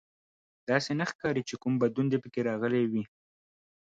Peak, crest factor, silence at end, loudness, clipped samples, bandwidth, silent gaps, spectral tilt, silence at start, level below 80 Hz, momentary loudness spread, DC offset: -12 dBFS; 20 dB; 0.9 s; -30 LUFS; under 0.1%; 7.8 kHz; 1.15-1.19 s; -6.5 dB/octave; 0.7 s; -70 dBFS; 5 LU; under 0.1%